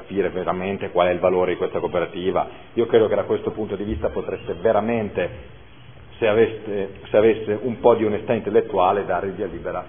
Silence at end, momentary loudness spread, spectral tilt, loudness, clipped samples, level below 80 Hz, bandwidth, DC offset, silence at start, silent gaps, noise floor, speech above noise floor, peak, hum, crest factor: 0 s; 10 LU; -11 dB/octave; -22 LUFS; under 0.1%; -46 dBFS; 3.6 kHz; 0.5%; 0 s; none; -45 dBFS; 24 dB; -2 dBFS; none; 20 dB